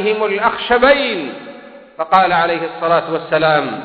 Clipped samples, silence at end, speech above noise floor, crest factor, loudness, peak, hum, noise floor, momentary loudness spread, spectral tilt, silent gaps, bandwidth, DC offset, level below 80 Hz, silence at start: under 0.1%; 0 s; 22 dB; 16 dB; -15 LUFS; 0 dBFS; none; -36 dBFS; 14 LU; -7 dB/octave; none; 5.6 kHz; under 0.1%; -48 dBFS; 0 s